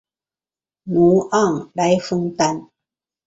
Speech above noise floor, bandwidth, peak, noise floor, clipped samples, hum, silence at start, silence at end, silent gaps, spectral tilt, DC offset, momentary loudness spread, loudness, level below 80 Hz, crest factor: over 73 dB; 8 kHz; -4 dBFS; under -90 dBFS; under 0.1%; none; 0.85 s; 0.6 s; none; -6 dB/octave; under 0.1%; 8 LU; -18 LUFS; -56 dBFS; 16 dB